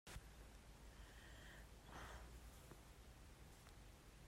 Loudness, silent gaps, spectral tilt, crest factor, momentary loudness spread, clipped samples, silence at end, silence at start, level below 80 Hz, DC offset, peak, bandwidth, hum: -62 LUFS; none; -4 dB/octave; 16 dB; 6 LU; under 0.1%; 0 s; 0.05 s; -64 dBFS; under 0.1%; -44 dBFS; 16 kHz; none